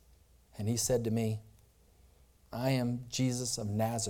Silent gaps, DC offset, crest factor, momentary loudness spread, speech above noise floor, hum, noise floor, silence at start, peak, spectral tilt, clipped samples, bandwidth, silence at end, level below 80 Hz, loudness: none; under 0.1%; 16 dB; 11 LU; 30 dB; none; -63 dBFS; 0.55 s; -18 dBFS; -5 dB/octave; under 0.1%; 18 kHz; 0 s; -60 dBFS; -33 LUFS